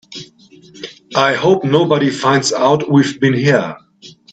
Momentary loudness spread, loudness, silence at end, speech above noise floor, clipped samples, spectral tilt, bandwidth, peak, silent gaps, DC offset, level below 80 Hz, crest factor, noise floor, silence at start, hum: 20 LU; -14 LUFS; 0.2 s; 31 dB; under 0.1%; -5 dB/octave; 9 kHz; 0 dBFS; none; under 0.1%; -58 dBFS; 14 dB; -44 dBFS; 0.1 s; none